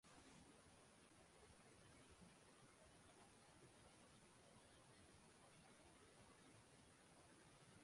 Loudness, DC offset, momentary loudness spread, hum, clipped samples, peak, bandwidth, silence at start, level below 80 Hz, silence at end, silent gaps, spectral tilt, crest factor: -69 LUFS; under 0.1%; 2 LU; none; under 0.1%; -54 dBFS; 11.5 kHz; 0.05 s; -82 dBFS; 0 s; none; -3.5 dB/octave; 16 dB